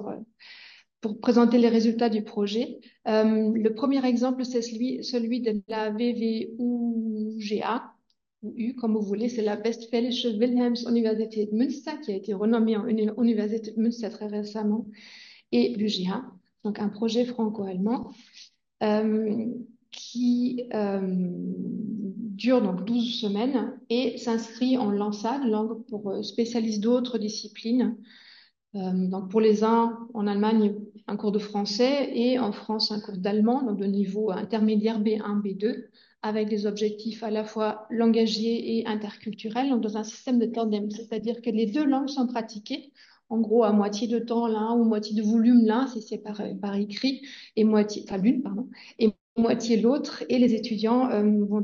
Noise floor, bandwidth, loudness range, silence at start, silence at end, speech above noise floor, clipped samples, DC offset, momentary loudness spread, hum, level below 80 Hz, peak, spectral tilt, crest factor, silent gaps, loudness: -56 dBFS; 7.2 kHz; 4 LU; 0 s; 0 s; 30 dB; under 0.1%; under 0.1%; 11 LU; none; -74 dBFS; -8 dBFS; -6.5 dB/octave; 18 dB; 49.21-49.36 s; -26 LUFS